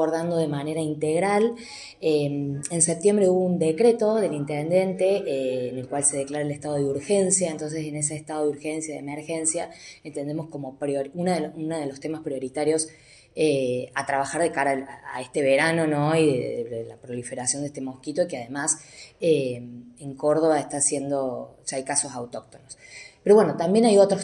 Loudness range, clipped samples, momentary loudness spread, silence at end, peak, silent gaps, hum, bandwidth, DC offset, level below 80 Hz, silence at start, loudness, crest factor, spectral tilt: 6 LU; under 0.1%; 14 LU; 0 s; -6 dBFS; none; none; 12 kHz; under 0.1%; -66 dBFS; 0 s; -24 LUFS; 18 dB; -4.5 dB/octave